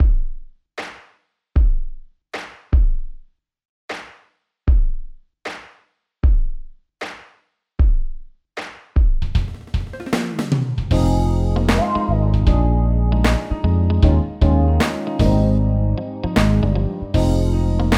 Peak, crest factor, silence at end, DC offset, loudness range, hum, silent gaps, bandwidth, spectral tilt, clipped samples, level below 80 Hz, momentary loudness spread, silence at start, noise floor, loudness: -2 dBFS; 16 dB; 0 s; under 0.1%; 8 LU; none; 3.65-3.88 s; 12 kHz; -7.5 dB/octave; under 0.1%; -20 dBFS; 16 LU; 0 s; -60 dBFS; -19 LUFS